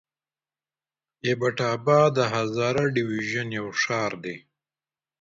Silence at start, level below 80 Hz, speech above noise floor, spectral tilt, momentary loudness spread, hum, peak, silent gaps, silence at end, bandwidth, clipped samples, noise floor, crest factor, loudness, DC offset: 1.25 s; -64 dBFS; over 66 dB; -5.5 dB/octave; 11 LU; none; -8 dBFS; none; 0.8 s; 7.8 kHz; under 0.1%; under -90 dBFS; 18 dB; -24 LUFS; under 0.1%